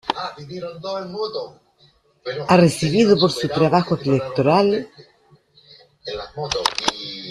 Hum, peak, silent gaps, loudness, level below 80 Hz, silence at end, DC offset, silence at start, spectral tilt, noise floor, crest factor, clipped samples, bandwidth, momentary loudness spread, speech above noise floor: none; 0 dBFS; none; -19 LUFS; -54 dBFS; 0 s; under 0.1%; 0.05 s; -5.5 dB/octave; -57 dBFS; 20 dB; under 0.1%; 13 kHz; 17 LU; 38 dB